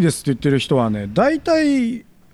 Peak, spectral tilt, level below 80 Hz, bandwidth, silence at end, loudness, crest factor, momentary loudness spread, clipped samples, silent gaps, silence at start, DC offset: -4 dBFS; -6 dB/octave; -46 dBFS; 13.5 kHz; 0.3 s; -18 LUFS; 14 dB; 4 LU; under 0.1%; none; 0 s; under 0.1%